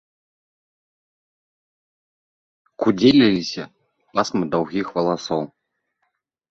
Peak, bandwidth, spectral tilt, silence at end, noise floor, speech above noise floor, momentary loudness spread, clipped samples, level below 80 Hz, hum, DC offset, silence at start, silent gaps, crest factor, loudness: -2 dBFS; 7.6 kHz; -5.5 dB/octave; 1.05 s; -74 dBFS; 55 dB; 15 LU; under 0.1%; -58 dBFS; none; under 0.1%; 2.8 s; none; 22 dB; -20 LUFS